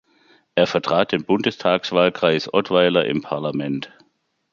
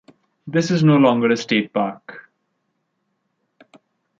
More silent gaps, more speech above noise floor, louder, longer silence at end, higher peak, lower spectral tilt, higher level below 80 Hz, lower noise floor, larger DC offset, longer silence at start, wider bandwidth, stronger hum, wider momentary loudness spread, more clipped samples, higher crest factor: neither; second, 47 dB vs 55 dB; about the same, -20 LUFS vs -18 LUFS; second, 0.65 s vs 2 s; about the same, -2 dBFS vs -2 dBFS; about the same, -6 dB/octave vs -6.5 dB/octave; first, -60 dBFS vs -66 dBFS; second, -66 dBFS vs -72 dBFS; neither; about the same, 0.55 s vs 0.45 s; about the same, 7.2 kHz vs 7.6 kHz; neither; second, 8 LU vs 15 LU; neither; about the same, 18 dB vs 18 dB